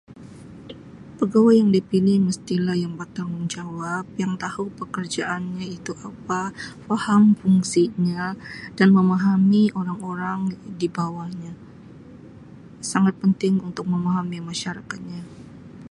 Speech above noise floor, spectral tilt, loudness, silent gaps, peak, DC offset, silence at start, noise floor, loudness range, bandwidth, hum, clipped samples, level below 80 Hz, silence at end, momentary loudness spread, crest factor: 22 dB; -6.5 dB/octave; -22 LUFS; none; -4 dBFS; under 0.1%; 0.1 s; -43 dBFS; 9 LU; 11.5 kHz; none; under 0.1%; -58 dBFS; 0.05 s; 20 LU; 18 dB